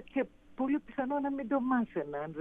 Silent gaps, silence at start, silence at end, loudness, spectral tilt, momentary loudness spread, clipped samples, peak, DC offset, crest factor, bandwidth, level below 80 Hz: none; 0 s; 0 s; -34 LUFS; -9 dB/octave; 7 LU; under 0.1%; -18 dBFS; under 0.1%; 16 dB; 3.7 kHz; -64 dBFS